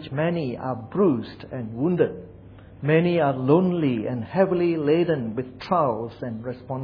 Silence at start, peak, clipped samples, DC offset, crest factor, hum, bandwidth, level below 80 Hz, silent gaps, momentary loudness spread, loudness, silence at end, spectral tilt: 0 s; -4 dBFS; under 0.1%; under 0.1%; 18 dB; none; 5.4 kHz; -56 dBFS; none; 12 LU; -24 LUFS; 0 s; -10 dB/octave